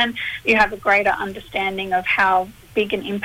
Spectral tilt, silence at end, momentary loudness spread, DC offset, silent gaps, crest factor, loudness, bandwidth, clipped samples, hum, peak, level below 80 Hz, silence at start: -4.5 dB/octave; 0 s; 8 LU; under 0.1%; none; 16 dB; -19 LUFS; 16 kHz; under 0.1%; none; -4 dBFS; -48 dBFS; 0 s